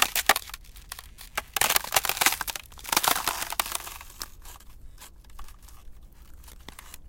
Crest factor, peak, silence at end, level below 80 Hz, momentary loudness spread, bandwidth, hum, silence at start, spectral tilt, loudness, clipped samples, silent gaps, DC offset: 28 dB; -2 dBFS; 0 s; -48 dBFS; 24 LU; 17 kHz; none; 0 s; 0 dB/octave; -25 LUFS; under 0.1%; none; under 0.1%